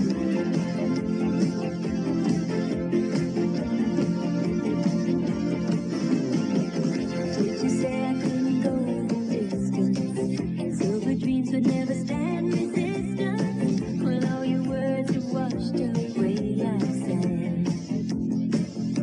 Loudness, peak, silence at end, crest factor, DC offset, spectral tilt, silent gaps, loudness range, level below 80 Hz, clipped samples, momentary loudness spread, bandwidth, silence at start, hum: -26 LUFS; -10 dBFS; 0 s; 14 dB; under 0.1%; -7.5 dB/octave; none; 1 LU; -52 dBFS; under 0.1%; 3 LU; 10.5 kHz; 0 s; none